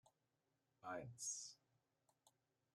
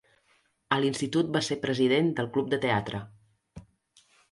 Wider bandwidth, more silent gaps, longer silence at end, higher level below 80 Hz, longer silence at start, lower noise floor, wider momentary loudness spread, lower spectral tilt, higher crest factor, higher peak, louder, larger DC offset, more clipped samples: first, 13 kHz vs 11.5 kHz; neither; second, 0.45 s vs 0.7 s; second, -88 dBFS vs -62 dBFS; second, 0.05 s vs 0.7 s; first, -88 dBFS vs -69 dBFS; first, 10 LU vs 6 LU; second, -2 dB/octave vs -5.5 dB/octave; about the same, 20 dB vs 22 dB; second, -36 dBFS vs -8 dBFS; second, -51 LUFS vs -27 LUFS; neither; neither